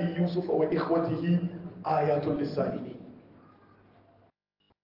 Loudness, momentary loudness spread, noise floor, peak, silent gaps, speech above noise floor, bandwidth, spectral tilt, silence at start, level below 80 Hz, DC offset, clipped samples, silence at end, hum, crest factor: -29 LUFS; 12 LU; -73 dBFS; -14 dBFS; none; 45 dB; 5.8 kHz; -10 dB/octave; 0 s; -66 dBFS; under 0.1%; under 0.1%; 1.65 s; none; 16 dB